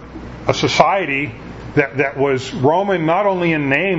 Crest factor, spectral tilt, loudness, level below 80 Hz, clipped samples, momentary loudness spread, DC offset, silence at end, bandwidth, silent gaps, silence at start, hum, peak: 18 dB; -5.5 dB/octave; -17 LUFS; -44 dBFS; under 0.1%; 9 LU; under 0.1%; 0 s; 8 kHz; none; 0 s; none; 0 dBFS